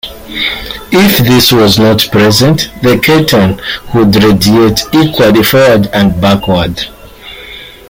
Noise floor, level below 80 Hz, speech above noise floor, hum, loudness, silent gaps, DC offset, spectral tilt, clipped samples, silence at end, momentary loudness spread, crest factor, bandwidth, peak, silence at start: -29 dBFS; -32 dBFS; 22 dB; none; -7 LUFS; none; under 0.1%; -5 dB/octave; 0.1%; 0.2 s; 14 LU; 8 dB; 17.5 kHz; 0 dBFS; 0.05 s